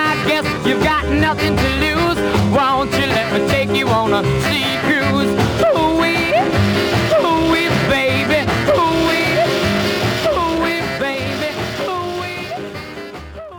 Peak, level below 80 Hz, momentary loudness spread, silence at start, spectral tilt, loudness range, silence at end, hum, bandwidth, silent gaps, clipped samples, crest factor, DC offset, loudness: -2 dBFS; -36 dBFS; 7 LU; 0 s; -5 dB/octave; 4 LU; 0 s; none; over 20 kHz; none; under 0.1%; 14 dB; under 0.1%; -16 LUFS